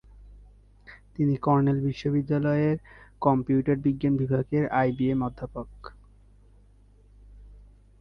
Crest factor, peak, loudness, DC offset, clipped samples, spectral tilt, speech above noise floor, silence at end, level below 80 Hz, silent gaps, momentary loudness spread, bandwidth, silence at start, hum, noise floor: 20 dB; -8 dBFS; -26 LUFS; under 0.1%; under 0.1%; -10 dB/octave; 31 dB; 0.4 s; -50 dBFS; none; 15 LU; 6.4 kHz; 0.2 s; 50 Hz at -45 dBFS; -56 dBFS